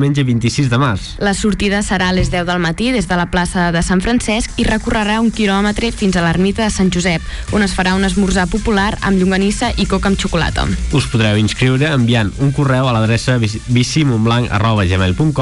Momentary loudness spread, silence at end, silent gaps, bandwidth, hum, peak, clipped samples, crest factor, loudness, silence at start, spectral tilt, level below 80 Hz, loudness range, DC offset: 3 LU; 0 s; none; 11.5 kHz; none; -4 dBFS; under 0.1%; 10 dB; -15 LUFS; 0 s; -5.5 dB/octave; -26 dBFS; 1 LU; under 0.1%